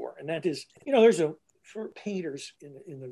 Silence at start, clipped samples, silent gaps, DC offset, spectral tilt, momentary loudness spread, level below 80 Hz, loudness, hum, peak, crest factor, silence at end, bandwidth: 0 s; under 0.1%; none; under 0.1%; -5 dB/octave; 23 LU; -80 dBFS; -27 LUFS; none; -10 dBFS; 20 dB; 0 s; 12 kHz